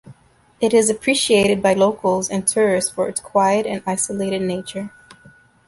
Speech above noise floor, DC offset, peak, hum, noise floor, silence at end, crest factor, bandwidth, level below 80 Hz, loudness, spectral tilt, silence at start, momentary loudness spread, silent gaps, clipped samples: 31 dB; under 0.1%; -4 dBFS; none; -50 dBFS; 0.8 s; 16 dB; 12 kHz; -54 dBFS; -18 LUFS; -3.5 dB/octave; 0.05 s; 9 LU; none; under 0.1%